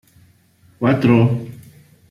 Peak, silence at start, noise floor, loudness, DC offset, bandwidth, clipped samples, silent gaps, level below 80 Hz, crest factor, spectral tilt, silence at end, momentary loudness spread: -2 dBFS; 0.8 s; -53 dBFS; -16 LUFS; under 0.1%; 11.5 kHz; under 0.1%; none; -54 dBFS; 16 dB; -9 dB/octave; 0.55 s; 13 LU